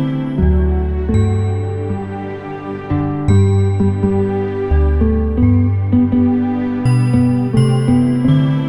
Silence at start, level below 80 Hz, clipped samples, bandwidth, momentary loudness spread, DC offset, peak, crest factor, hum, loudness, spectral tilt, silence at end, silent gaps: 0 s; -22 dBFS; under 0.1%; 11 kHz; 8 LU; 0.8%; -2 dBFS; 12 dB; none; -15 LUFS; -9 dB/octave; 0 s; none